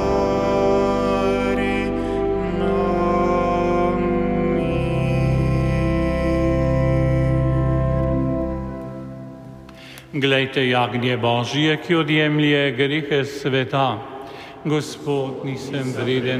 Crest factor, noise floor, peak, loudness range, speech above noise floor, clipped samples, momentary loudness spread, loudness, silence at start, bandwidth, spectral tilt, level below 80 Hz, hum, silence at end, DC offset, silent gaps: 16 dB; -40 dBFS; -4 dBFS; 4 LU; 20 dB; under 0.1%; 12 LU; -20 LUFS; 0 s; 12 kHz; -7 dB/octave; -32 dBFS; none; 0 s; under 0.1%; none